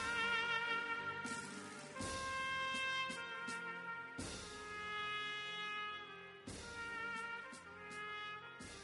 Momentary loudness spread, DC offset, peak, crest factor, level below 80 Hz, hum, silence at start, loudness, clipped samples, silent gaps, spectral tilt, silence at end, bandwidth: 13 LU; under 0.1%; -26 dBFS; 18 dB; -68 dBFS; none; 0 s; -43 LUFS; under 0.1%; none; -2 dB/octave; 0 s; 11.5 kHz